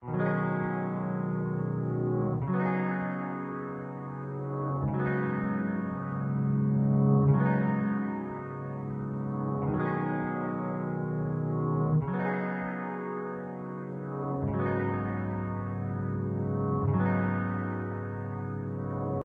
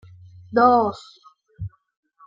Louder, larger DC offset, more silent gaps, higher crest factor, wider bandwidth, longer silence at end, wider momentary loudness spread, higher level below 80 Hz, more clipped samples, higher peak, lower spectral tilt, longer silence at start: second, -31 LUFS vs -19 LUFS; neither; neither; about the same, 16 dB vs 20 dB; second, 3.7 kHz vs 7.6 kHz; second, 0 s vs 0.6 s; second, 9 LU vs 21 LU; about the same, -56 dBFS vs -54 dBFS; neither; second, -14 dBFS vs -4 dBFS; first, -11.5 dB/octave vs -7.5 dB/octave; second, 0 s vs 0.5 s